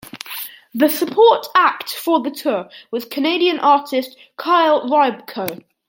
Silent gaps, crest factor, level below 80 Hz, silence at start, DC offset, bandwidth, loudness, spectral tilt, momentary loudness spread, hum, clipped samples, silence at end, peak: none; 16 dB; -70 dBFS; 0.05 s; under 0.1%; 17 kHz; -17 LUFS; -3.5 dB/octave; 15 LU; none; under 0.1%; 0.3 s; -2 dBFS